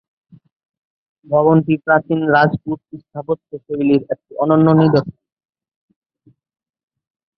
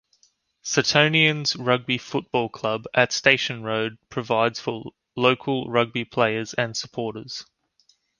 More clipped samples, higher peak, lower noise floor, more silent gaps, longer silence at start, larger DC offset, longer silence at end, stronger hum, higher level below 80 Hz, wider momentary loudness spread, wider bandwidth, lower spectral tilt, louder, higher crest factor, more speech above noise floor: neither; about the same, -2 dBFS vs -2 dBFS; second, -56 dBFS vs -64 dBFS; neither; first, 1.3 s vs 0.65 s; neither; first, 2.3 s vs 0.75 s; neither; first, -56 dBFS vs -62 dBFS; about the same, 15 LU vs 14 LU; second, 5.8 kHz vs 10.5 kHz; first, -10 dB/octave vs -4 dB/octave; first, -16 LUFS vs -22 LUFS; second, 16 dB vs 22 dB; about the same, 41 dB vs 41 dB